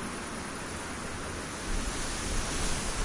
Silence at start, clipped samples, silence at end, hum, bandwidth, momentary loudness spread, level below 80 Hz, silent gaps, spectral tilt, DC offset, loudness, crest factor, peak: 0 s; under 0.1%; 0 s; none; 11.5 kHz; 5 LU; -38 dBFS; none; -3 dB/octave; under 0.1%; -34 LUFS; 16 dB; -18 dBFS